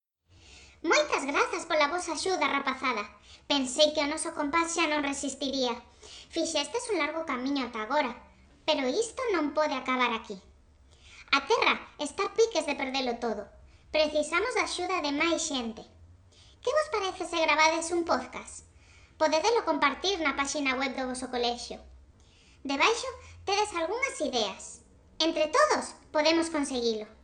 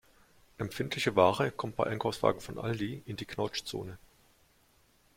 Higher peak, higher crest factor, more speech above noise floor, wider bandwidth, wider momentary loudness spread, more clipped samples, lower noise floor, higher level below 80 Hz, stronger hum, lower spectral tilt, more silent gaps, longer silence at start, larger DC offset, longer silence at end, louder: about the same, -8 dBFS vs -8 dBFS; about the same, 22 dB vs 24 dB; second, 30 dB vs 35 dB; second, 10.5 kHz vs 16.5 kHz; second, 12 LU vs 15 LU; neither; second, -59 dBFS vs -67 dBFS; about the same, -60 dBFS vs -62 dBFS; neither; second, -2 dB/octave vs -5.5 dB/octave; neither; about the same, 0.5 s vs 0.6 s; neither; second, 0.1 s vs 1.2 s; first, -28 LUFS vs -32 LUFS